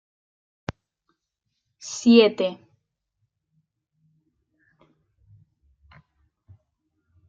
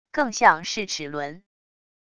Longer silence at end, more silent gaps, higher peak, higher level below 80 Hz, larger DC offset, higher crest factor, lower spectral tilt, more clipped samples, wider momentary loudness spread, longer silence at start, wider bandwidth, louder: first, 4.75 s vs 0.8 s; neither; about the same, -4 dBFS vs -2 dBFS; about the same, -64 dBFS vs -62 dBFS; neither; about the same, 24 dB vs 24 dB; first, -4.5 dB/octave vs -2.5 dB/octave; neither; first, 24 LU vs 14 LU; first, 1.85 s vs 0.15 s; second, 7.6 kHz vs 11 kHz; first, -19 LUFS vs -22 LUFS